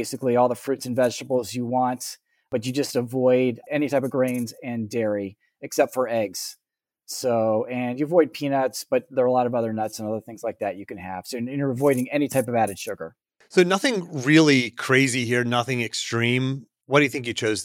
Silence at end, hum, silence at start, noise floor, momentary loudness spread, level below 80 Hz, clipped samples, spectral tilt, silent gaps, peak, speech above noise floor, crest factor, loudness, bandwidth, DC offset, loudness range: 0 s; none; 0 s; -55 dBFS; 12 LU; -70 dBFS; under 0.1%; -5 dB/octave; none; -4 dBFS; 32 dB; 20 dB; -23 LUFS; 17 kHz; under 0.1%; 5 LU